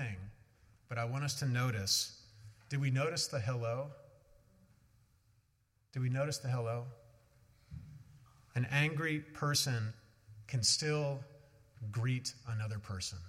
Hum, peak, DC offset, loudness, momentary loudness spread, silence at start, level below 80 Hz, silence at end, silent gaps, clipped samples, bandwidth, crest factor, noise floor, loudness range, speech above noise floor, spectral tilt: none; -16 dBFS; under 0.1%; -36 LUFS; 19 LU; 0 s; -68 dBFS; 0 s; none; under 0.1%; 16 kHz; 22 dB; -75 dBFS; 7 LU; 39 dB; -4 dB/octave